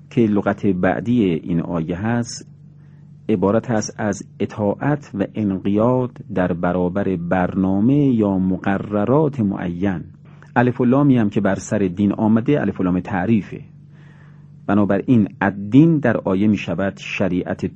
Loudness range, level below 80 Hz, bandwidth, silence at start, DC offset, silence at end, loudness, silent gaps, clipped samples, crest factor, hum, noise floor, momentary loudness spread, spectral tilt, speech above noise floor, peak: 4 LU; -52 dBFS; 8.8 kHz; 0.1 s; under 0.1%; 0 s; -19 LUFS; none; under 0.1%; 18 dB; none; -43 dBFS; 8 LU; -7.5 dB/octave; 25 dB; 0 dBFS